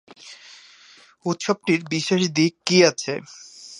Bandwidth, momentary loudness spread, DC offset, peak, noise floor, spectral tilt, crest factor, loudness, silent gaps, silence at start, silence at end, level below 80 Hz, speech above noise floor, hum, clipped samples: 11.5 kHz; 24 LU; under 0.1%; -2 dBFS; -51 dBFS; -4 dB/octave; 22 dB; -21 LUFS; none; 0.25 s; 0 s; -68 dBFS; 30 dB; none; under 0.1%